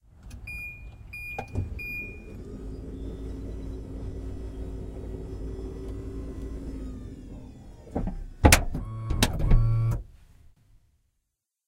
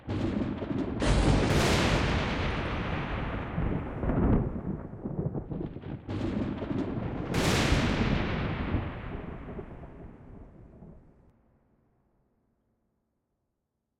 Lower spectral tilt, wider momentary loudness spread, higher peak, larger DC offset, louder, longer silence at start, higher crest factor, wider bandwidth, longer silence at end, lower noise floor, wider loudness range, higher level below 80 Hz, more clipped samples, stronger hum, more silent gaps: about the same, -4.5 dB/octave vs -5.5 dB/octave; first, 19 LU vs 16 LU; first, 0 dBFS vs -12 dBFS; neither; about the same, -30 LUFS vs -30 LUFS; first, 0.15 s vs 0 s; first, 30 dB vs 18 dB; about the same, 16 kHz vs 16 kHz; second, 1.4 s vs 3 s; about the same, -80 dBFS vs -82 dBFS; about the same, 12 LU vs 12 LU; first, -32 dBFS vs -38 dBFS; neither; neither; neither